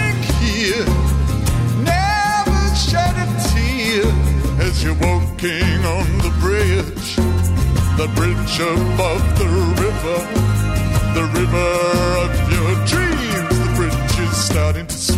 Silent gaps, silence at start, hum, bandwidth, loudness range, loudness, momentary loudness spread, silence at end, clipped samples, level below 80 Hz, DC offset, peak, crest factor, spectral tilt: none; 0 s; none; 16 kHz; 1 LU; -17 LUFS; 2 LU; 0 s; under 0.1%; -22 dBFS; under 0.1%; -6 dBFS; 10 dB; -5 dB/octave